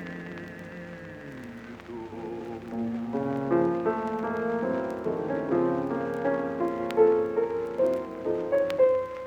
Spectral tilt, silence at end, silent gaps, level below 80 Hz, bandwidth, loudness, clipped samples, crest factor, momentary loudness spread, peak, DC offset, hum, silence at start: -8 dB/octave; 0 s; none; -60 dBFS; 9.2 kHz; -28 LUFS; under 0.1%; 18 dB; 18 LU; -10 dBFS; under 0.1%; none; 0 s